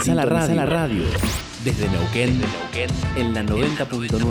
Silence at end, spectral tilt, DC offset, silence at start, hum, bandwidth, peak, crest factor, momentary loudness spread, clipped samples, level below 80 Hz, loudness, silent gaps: 0 s; -5.5 dB/octave; under 0.1%; 0 s; none; over 20 kHz; -6 dBFS; 14 dB; 6 LU; under 0.1%; -34 dBFS; -22 LUFS; none